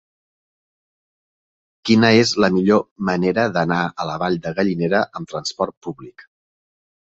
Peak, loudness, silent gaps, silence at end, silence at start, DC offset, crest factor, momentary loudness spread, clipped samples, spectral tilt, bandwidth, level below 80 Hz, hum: -2 dBFS; -19 LUFS; 2.91-2.96 s, 5.77-5.81 s; 0.9 s; 1.85 s; under 0.1%; 18 dB; 13 LU; under 0.1%; -5.5 dB/octave; 8 kHz; -56 dBFS; none